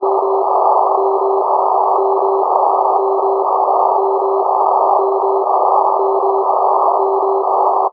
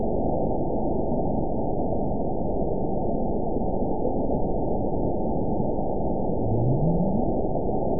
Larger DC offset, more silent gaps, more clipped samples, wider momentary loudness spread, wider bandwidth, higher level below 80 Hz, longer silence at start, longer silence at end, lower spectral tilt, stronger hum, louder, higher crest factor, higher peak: second, under 0.1% vs 4%; neither; neither; about the same, 2 LU vs 3 LU; first, 4.9 kHz vs 1 kHz; second, -80 dBFS vs -34 dBFS; about the same, 0 s vs 0 s; about the same, 0 s vs 0 s; second, -8 dB/octave vs -18.5 dB/octave; neither; first, -14 LUFS vs -26 LUFS; about the same, 14 dB vs 14 dB; first, 0 dBFS vs -10 dBFS